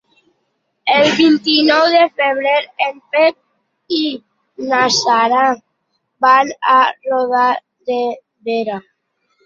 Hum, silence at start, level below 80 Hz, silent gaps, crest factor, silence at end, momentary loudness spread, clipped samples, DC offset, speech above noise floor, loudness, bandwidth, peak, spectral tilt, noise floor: none; 0.85 s; -64 dBFS; none; 14 dB; 0.65 s; 12 LU; under 0.1%; under 0.1%; 55 dB; -14 LUFS; 7.6 kHz; -2 dBFS; -3 dB/octave; -69 dBFS